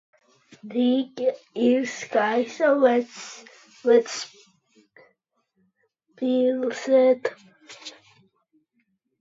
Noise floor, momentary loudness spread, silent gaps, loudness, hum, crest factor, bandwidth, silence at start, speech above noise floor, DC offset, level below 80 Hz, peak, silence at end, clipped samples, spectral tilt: -72 dBFS; 20 LU; none; -23 LUFS; none; 18 dB; 7.8 kHz; 0.65 s; 50 dB; under 0.1%; -82 dBFS; -6 dBFS; 1.3 s; under 0.1%; -4 dB/octave